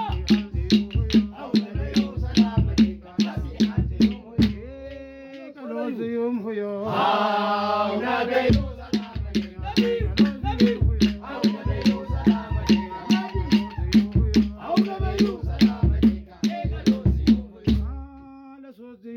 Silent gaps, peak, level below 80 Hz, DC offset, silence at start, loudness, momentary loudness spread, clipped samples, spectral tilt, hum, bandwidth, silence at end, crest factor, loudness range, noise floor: none; -6 dBFS; -32 dBFS; under 0.1%; 0 s; -23 LUFS; 8 LU; under 0.1%; -7 dB/octave; none; 7 kHz; 0 s; 16 dB; 4 LU; -43 dBFS